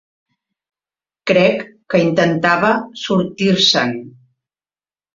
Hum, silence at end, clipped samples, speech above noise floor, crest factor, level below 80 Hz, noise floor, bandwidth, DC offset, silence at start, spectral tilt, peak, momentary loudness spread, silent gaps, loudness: none; 1.05 s; under 0.1%; over 75 dB; 16 dB; -58 dBFS; under -90 dBFS; 7.6 kHz; under 0.1%; 1.25 s; -5 dB/octave; -2 dBFS; 9 LU; none; -15 LUFS